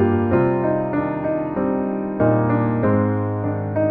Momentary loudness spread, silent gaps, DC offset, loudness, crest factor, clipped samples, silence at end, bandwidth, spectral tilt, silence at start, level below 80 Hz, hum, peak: 5 LU; none; under 0.1%; -20 LUFS; 14 dB; under 0.1%; 0 s; 3.8 kHz; -12.5 dB/octave; 0 s; -48 dBFS; none; -4 dBFS